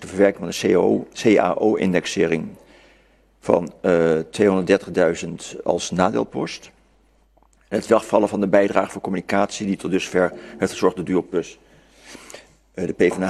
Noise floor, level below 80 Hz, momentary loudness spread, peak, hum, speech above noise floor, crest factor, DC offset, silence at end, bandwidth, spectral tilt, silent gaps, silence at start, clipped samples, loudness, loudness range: -58 dBFS; -54 dBFS; 12 LU; 0 dBFS; none; 38 dB; 20 dB; under 0.1%; 0 s; 13 kHz; -5.5 dB/octave; none; 0 s; under 0.1%; -20 LUFS; 4 LU